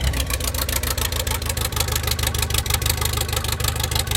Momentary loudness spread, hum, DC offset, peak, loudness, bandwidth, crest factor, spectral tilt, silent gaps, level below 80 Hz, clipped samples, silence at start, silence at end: 2 LU; none; under 0.1%; -2 dBFS; -22 LUFS; 17.5 kHz; 20 dB; -2.5 dB/octave; none; -28 dBFS; under 0.1%; 0 s; 0 s